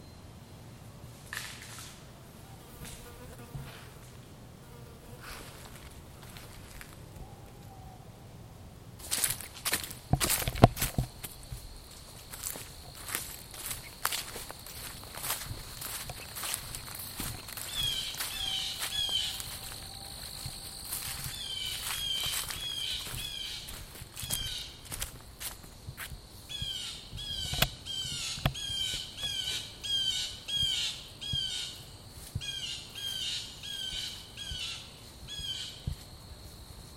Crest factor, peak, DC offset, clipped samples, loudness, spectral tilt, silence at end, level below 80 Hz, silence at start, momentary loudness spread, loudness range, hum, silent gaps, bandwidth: 36 dB; -2 dBFS; under 0.1%; under 0.1%; -34 LUFS; -2.5 dB/octave; 0 s; -50 dBFS; 0 s; 19 LU; 16 LU; none; none; 16.5 kHz